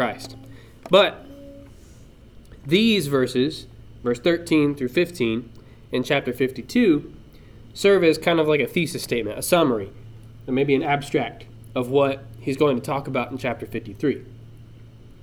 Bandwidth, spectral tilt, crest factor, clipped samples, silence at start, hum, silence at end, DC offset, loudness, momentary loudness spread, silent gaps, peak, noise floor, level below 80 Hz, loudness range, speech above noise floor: 19 kHz; -5.5 dB/octave; 20 dB; under 0.1%; 0 s; none; 0.15 s; under 0.1%; -22 LUFS; 17 LU; none; -2 dBFS; -46 dBFS; -50 dBFS; 3 LU; 25 dB